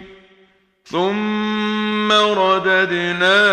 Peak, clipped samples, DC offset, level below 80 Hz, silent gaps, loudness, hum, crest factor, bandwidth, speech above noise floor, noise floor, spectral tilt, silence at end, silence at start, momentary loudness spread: 0 dBFS; under 0.1%; under 0.1%; -58 dBFS; none; -17 LUFS; none; 16 dB; 10 kHz; 40 dB; -55 dBFS; -4.5 dB/octave; 0 s; 0 s; 6 LU